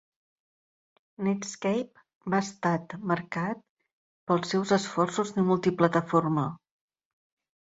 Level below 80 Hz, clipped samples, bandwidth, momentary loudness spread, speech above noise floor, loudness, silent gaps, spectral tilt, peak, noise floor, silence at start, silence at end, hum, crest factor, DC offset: -70 dBFS; under 0.1%; 8 kHz; 9 LU; over 63 dB; -28 LUFS; 2.15-2.21 s, 3.69-3.77 s, 3.93-4.27 s; -6 dB/octave; -6 dBFS; under -90 dBFS; 1.2 s; 1.1 s; none; 22 dB; under 0.1%